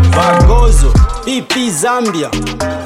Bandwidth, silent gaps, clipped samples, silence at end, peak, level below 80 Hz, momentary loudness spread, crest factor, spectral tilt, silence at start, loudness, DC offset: 14 kHz; none; under 0.1%; 0 s; 0 dBFS; -12 dBFS; 9 LU; 10 dB; -5 dB/octave; 0 s; -12 LUFS; under 0.1%